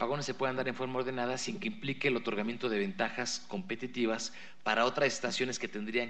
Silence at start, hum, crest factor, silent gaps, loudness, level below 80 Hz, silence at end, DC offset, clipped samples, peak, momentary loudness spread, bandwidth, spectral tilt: 0 s; none; 20 dB; none; -34 LUFS; -78 dBFS; 0 s; 0.5%; under 0.1%; -14 dBFS; 8 LU; 9.2 kHz; -4 dB/octave